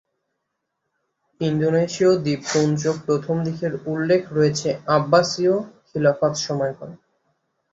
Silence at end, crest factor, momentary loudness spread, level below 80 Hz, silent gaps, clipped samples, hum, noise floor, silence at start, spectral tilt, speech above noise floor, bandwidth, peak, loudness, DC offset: 0.75 s; 18 dB; 8 LU; -60 dBFS; none; under 0.1%; none; -78 dBFS; 1.4 s; -5.5 dB/octave; 57 dB; 7.8 kHz; -4 dBFS; -21 LUFS; under 0.1%